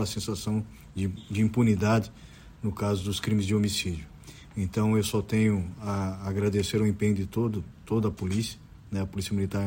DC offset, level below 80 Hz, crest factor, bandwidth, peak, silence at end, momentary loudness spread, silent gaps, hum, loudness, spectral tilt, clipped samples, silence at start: under 0.1%; -52 dBFS; 16 dB; 16.5 kHz; -12 dBFS; 0 s; 11 LU; none; none; -28 LUFS; -6 dB/octave; under 0.1%; 0 s